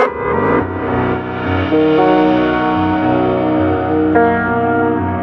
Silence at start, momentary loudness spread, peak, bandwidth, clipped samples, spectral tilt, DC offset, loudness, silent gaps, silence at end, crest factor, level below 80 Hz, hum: 0 s; 6 LU; 0 dBFS; 5.8 kHz; under 0.1%; -9 dB/octave; under 0.1%; -14 LUFS; none; 0 s; 14 dB; -38 dBFS; none